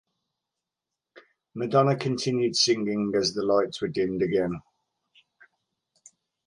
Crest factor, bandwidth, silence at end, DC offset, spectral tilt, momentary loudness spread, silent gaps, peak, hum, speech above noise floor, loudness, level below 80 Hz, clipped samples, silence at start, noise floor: 20 dB; 11.5 kHz; 1.85 s; under 0.1%; -4.5 dB/octave; 9 LU; none; -8 dBFS; none; 63 dB; -25 LUFS; -64 dBFS; under 0.1%; 1.15 s; -87 dBFS